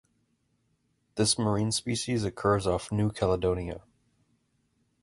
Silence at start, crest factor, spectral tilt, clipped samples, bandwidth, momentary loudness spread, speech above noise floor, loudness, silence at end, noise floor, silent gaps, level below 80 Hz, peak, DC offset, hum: 1.15 s; 20 dB; -5 dB/octave; under 0.1%; 11.5 kHz; 9 LU; 45 dB; -28 LUFS; 1.2 s; -73 dBFS; none; -50 dBFS; -12 dBFS; under 0.1%; none